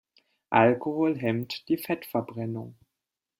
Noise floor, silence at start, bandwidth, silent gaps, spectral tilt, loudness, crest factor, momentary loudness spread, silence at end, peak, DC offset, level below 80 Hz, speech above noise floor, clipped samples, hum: -87 dBFS; 0.5 s; 16 kHz; none; -7 dB/octave; -27 LUFS; 22 dB; 13 LU; 0.65 s; -6 dBFS; under 0.1%; -68 dBFS; 60 dB; under 0.1%; none